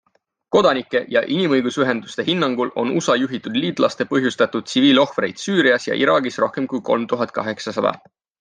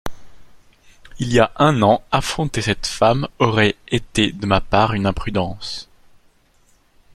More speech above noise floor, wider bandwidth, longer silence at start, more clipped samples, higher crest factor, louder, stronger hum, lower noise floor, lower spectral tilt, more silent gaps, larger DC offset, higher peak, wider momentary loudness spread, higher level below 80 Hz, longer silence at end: about the same, 39 dB vs 38 dB; second, 9.8 kHz vs 14.5 kHz; first, 0.5 s vs 0.05 s; neither; about the same, 16 dB vs 20 dB; about the same, -19 LUFS vs -18 LUFS; neither; about the same, -58 dBFS vs -56 dBFS; about the same, -4.5 dB/octave vs -5 dB/octave; neither; neither; about the same, -2 dBFS vs 0 dBFS; second, 6 LU vs 11 LU; second, -64 dBFS vs -38 dBFS; second, 0.45 s vs 1.3 s